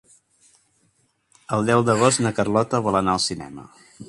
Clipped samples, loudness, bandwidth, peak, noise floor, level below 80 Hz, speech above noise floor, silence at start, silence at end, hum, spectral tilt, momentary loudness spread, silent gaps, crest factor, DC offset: under 0.1%; -20 LUFS; 11.5 kHz; -2 dBFS; -66 dBFS; -54 dBFS; 45 dB; 1.5 s; 0.05 s; none; -4.5 dB/octave; 14 LU; none; 20 dB; under 0.1%